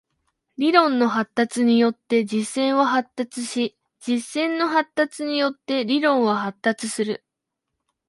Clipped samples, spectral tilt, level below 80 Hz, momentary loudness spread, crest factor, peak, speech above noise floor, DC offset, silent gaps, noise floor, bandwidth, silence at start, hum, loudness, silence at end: under 0.1%; -4 dB/octave; -72 dBFS; 9 LU; 22 dB; 0 dBFS; 61 dB; under 0.1%; none; -82 dBFS; 11.5 kHz; 0.6 s; none; -22 LUFS; 0.9 s